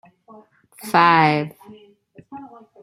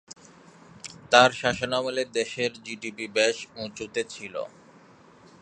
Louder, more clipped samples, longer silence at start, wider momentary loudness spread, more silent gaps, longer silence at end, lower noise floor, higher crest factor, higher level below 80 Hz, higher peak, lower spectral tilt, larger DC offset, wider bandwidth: first, -16 LUFS vs -25 LUFS; neither; first, 0.85 s vs 0.1 s; first, 26 LU vs 23 LU; neither; second, 0.35 s vs 0.95 s; about the same, -50 dBFS vs -53 dBFS; second, 20 dB vs 26 dB; about the same, -68 dBFS vs -64 dBFS; about the same, -2 dBFS vs 0 dBFS; first, -5.5 dB/octave vs -3 dB/octave; neither; first, 16 kHz vs 10.5 kHz